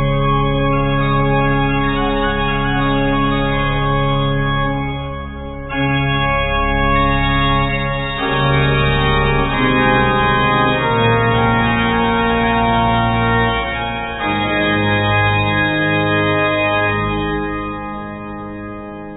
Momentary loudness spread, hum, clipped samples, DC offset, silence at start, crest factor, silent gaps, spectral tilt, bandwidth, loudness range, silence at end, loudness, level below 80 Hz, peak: 9 LU; none; under 0.1%; under 0.1%; 0 s; 14 dB; none; -9.5 dB/octave; 4 kHz; 4 LU; 0 s; -16 LUFS; -26 dBFS; -2 dBFS